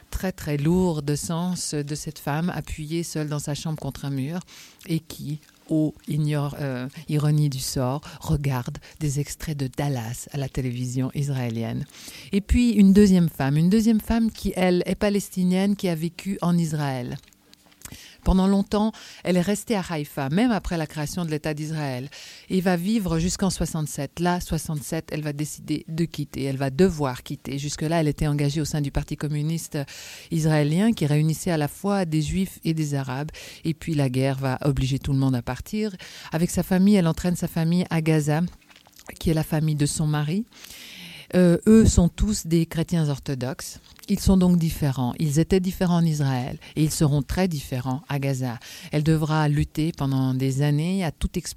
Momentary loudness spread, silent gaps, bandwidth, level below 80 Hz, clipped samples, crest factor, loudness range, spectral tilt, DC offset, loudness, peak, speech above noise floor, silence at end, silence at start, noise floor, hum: 11 LU; none; 16 kHz; -38 dBFS; under 0.1%; 22 dB; 7 LU; -6 dB/octave; under 0.1%; -24 LUFS; -2 dBFS; 31 dB; 0 s; 0.1 s; -55 dBFS; none